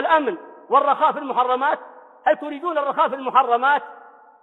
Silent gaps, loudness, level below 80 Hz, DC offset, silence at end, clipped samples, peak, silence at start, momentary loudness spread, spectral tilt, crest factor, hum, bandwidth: none; -20 LUFS; -70 dBFS; under 0.1%; 0.45 s; under 0.1%; -2 dBFS; 0 s; 8 LU; -5.5 dB/octave; 18 dB; none; 4.2 kHz